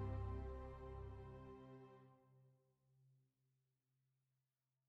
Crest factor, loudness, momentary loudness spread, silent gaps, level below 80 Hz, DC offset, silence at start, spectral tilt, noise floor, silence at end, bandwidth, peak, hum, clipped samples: 18 dB; -54 LUFS; 14 LU; none; -60 dBFS; under 0.1%; 0 s; -8.5 dB/octave; under -90 dBFS; 1.75 s; 5.6 kHz; -38 dBFS; none; under 0.1%